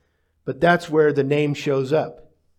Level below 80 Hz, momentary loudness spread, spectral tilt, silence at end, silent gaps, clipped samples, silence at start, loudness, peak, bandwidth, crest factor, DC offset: -58 dBFS; 15 LU; -6.5 dB/octave; 0.45 s; none; under 0.1%; 0.45 s; -20 LUFS; -4 dBFS; 12.5 kHz; 18 dB; under 0.1%